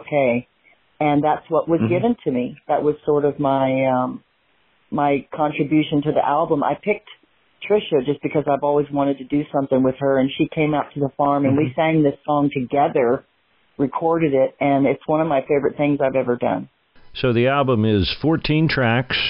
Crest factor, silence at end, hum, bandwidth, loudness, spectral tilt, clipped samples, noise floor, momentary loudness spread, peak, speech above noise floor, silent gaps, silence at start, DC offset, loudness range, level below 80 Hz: 12 dB; 0 s; none; 5.6 kHz; -20 LUFS; -11.5 dB/octave; under 0.1%; -62 dBFS; 6 LU; -6 dBFS; 43 dB; none; 0 s; under 0.1%; 2 LU; -48 dBFS